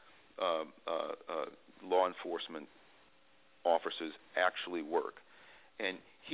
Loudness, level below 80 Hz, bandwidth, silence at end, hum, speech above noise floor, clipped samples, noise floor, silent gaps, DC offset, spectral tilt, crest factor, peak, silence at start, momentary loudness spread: -37 LUFS; -84 dBFS; 4 kHz; 0 s; none; 32 dB; under 0.1%; -68 dBFS; none; under 0.1%; -0.5 dB/octave; 22 dB; -16 dBFS; 0.4 s; 16 LU